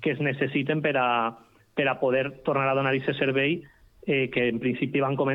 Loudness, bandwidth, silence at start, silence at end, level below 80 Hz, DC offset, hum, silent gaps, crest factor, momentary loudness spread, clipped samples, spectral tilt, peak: -26 LUFS; 5.4 kHz; 0 s; 0 s; -62 dBFS; under 0.1%; none; none; 16 dB; 4 LU; under 0.1%; -8.5 dB/octave; -10 dBFS